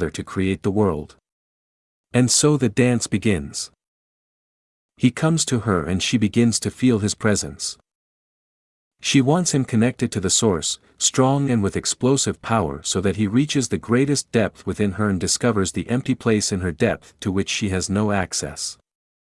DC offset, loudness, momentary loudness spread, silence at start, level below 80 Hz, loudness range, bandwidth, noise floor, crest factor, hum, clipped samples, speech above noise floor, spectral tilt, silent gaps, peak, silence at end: under 0.1%; -21 LUFS; 7 LU; 0 s; -50 dBFS; 3 LU; 12 kHz; under -90 dBFS; 18 dB; none; under 0.1%; over 70 dB; -4.5 dB/octave; 1.32-2.04 s, 3.88-4.89 s, 7.95-8.91 s; -2 dBFS; 0.55 s